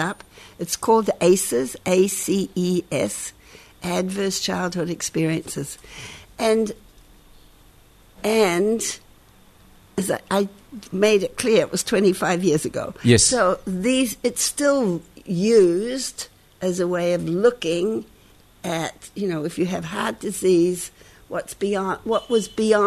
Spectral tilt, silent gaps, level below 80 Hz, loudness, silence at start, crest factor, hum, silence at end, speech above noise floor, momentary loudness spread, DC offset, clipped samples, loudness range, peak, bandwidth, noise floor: -4.5 dB/octave; none; -52 dBFS; -22 LUFS; 0 s; 20 dB; none; 0 s; 31 dB; 13 LU; under 0.1%; under 0.1%; 6 LU; -2 dBFS; 13.5 kHz; -52 dBFS